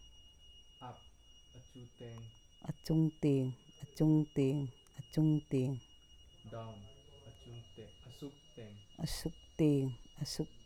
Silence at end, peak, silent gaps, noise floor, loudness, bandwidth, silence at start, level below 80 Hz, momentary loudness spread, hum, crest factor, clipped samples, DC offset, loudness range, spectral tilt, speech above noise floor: 0.2 s; -20 dBFS; none; -60 dBFS; -36 LUFS; 15.5 kHz; 0.2 s; -60 dBFS; 24 LU; none; 18 dB; under 0.1%; under 0.1%; 13 LU; -7.5 dB/octave; 24 dB